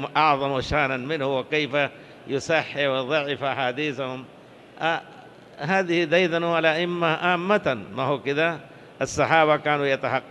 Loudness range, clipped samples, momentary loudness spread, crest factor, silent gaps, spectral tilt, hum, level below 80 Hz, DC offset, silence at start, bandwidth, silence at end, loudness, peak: 4 LU; under 0.1%; 10 LU; 20 dB; none; -5 dB/octave; none; -54 dBFS; under 0.1%; 0 s; 12 kHz; 0 s; -23 LUFS; -4 dBFS